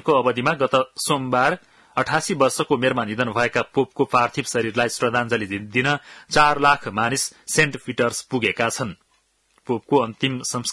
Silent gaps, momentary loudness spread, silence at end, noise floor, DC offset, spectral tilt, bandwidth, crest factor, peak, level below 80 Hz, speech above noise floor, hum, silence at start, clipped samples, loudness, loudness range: none; 6 LU; 0 s; -65 dBFS; under 0.1%; -4 dB/octave; 12 kHz; 18 dB; -4 dBFS; -56 dBFS; 44 dB; none; 0.05 s; under 0.1%; -21 LUFS; 3 LU